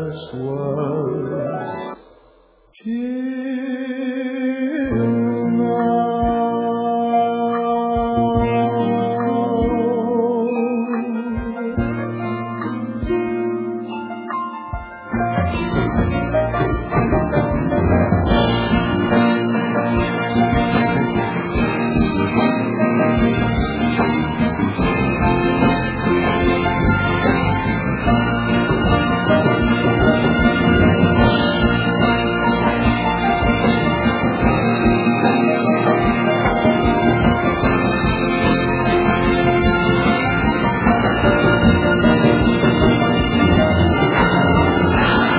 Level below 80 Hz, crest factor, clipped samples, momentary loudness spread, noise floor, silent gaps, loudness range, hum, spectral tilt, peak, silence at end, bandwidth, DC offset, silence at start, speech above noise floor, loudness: -30 dBFS; 16 dB; under 0.1%; 9 LU; -52 dBFS; none; 8 LU; none; -11 dB/octave; -2 dBFS; 0 s; 4 kHz; under 0.1%; 0 s; 30 dB; -17 LUFS